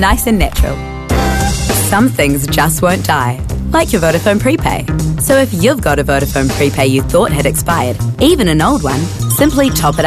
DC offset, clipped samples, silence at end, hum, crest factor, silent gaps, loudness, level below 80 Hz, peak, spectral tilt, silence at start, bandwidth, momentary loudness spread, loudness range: 0.3%; under 0.1%; 0 s; none; 12 dB; none; -12 LUFS; -22 dBFS; 0 dBFS; -5 dB/octave; 0 s; 14 kHz; 5 LU; 1 LU